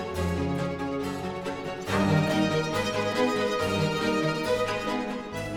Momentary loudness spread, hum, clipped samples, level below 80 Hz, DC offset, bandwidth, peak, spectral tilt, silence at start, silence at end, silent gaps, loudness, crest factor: 9 LU; none; under 0.1%; -50 dBFS; under 0.1%; 18 kHz; -12 dBFS; -5.5 dB/octave; 0 s; 0 s; none; -27 LUFS; 16 dB